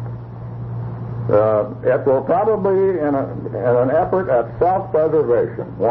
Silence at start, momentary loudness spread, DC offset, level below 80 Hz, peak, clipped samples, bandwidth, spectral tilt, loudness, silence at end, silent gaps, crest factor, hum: 0 s; 12 LU; under 0.1%; -46 dBFS; -4 dBFS; under 0.1%; 4.6 kHz; -12 dB/octave; -18 LUFS; 0 s; none; 14 dB; none